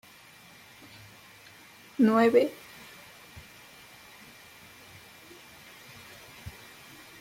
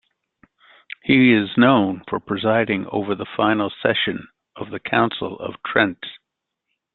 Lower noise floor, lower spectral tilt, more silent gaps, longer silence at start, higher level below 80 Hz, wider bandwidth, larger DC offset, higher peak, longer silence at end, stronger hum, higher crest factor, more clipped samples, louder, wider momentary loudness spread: second, -53 dBFS vs -80 dBFS; second, -5.5 dB/octave vs -10 dB/octave; neither; first, 2 s vs 1.05 s; second, -66 dBFS vs -58 dBFS; first, 16.5 kHz vs 4.3 kHz; neither; second, -10 dBFS vs -2 dBFS; about the same, 0.7 s vs 0.8 s; neither; about the same, 22 dB vs 20 dB; neither; second, -24 LUFS vs -19 LUFS; first, 27 LU vs 17 LU